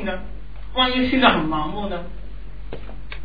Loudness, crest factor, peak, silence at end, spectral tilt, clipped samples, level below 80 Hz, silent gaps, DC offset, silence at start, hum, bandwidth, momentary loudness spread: -20 LUFS; 22 dB; -2 dBFS; 0 s; -7.5 dB/octave; under 0.1%; -36 dBFS; none; 3%; 0 s; none; 5 kHz; 23 LU